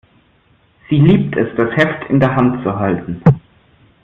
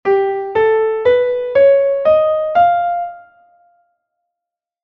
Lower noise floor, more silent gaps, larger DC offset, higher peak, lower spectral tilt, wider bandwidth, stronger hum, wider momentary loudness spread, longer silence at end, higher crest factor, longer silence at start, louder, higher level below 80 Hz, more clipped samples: second, -54 dBFS vs -84 dBFS; neither; neither; first, 0 dBFS vs -4 dBFS; first, -9.5 dB/octave vs -6.5 dB/octave; about the same, 5.2 kHz vs 5.2 kHz; neither; about the same, 7 LU vs 7 LU; second, 0.65 s vs 1.65 s; about the same, 14 dB vs 12 dB; first, 0.9 s vs 0.05 s; about the same, -15 LUFS vs -14 LUFS; first, -44 dBFS vs -54 dBFS; neither